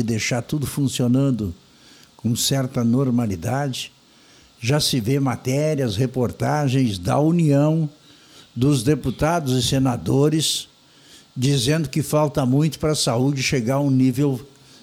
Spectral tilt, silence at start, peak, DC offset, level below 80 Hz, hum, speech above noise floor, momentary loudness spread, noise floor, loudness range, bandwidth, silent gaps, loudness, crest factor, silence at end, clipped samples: -5.5 dB/octave; 0 s; -6 dBFS; under 0.1%; -48 dBFS; none; 32 dB; 7 LU; -51 dBFS; 3 LU; 16 kHz; none; -21 LUFS; 16 dB; 0.35 s; under 0.1%